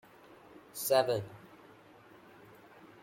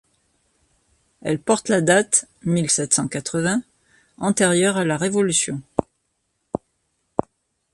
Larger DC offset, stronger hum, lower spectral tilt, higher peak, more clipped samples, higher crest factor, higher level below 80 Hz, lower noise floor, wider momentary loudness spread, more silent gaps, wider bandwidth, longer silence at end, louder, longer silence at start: neither; neither; about the same, -3.5 dB/octave vs -4 dB/octave; second, -14 dBFS vs 0 dBFS; neither; about the same, 24 dB vs 22 dB; second, -76 dBFS vs -56 dBFS; second, -58 dBFS vs -72 dBFS; first, 27 LU vs 12 LU; neither; first, 16.5 kHz vs 11.5 kHz; second, 0.15 s vs 1.15 s; second, -31 LUFS vs -20 LUFS; second, 0.75 s vs 1.25 s